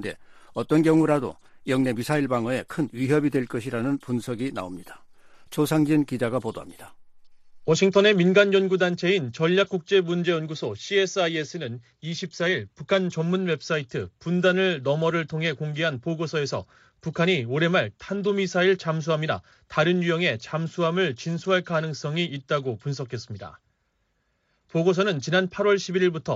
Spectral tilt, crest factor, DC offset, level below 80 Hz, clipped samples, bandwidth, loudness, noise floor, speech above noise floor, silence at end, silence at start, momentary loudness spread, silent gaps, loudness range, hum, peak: -5.5 dB/octave; 20 dB; under 0.1%; -62 dBFS; under 0.1%; 14 kHz; -24 LUFS; -72 dBFS; 48 dB; 0 s; 0 s; 13 LU; none; 6 LU; none; -6 dBFS